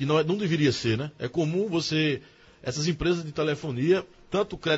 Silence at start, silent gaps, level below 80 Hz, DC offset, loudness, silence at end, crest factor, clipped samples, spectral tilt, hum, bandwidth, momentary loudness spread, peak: 0 s; none; -50 dBFS; under 0.1%; -27 LUFS; 0 s; 16 dB; under 0.1%; -5.5 dB/octave; none; 8 kHz; 7 LU; -10 dBFS